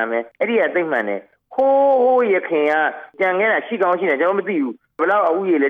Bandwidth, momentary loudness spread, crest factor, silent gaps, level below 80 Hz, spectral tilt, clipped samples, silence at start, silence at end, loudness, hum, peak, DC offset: 4.7 kHz; 8 LU; 10 dB; none; -76 dBFS; -7 dB/octave; under 0.1%; 0 s; 0 s; -18 LUFS; none; -6 dBFS; under 0.1%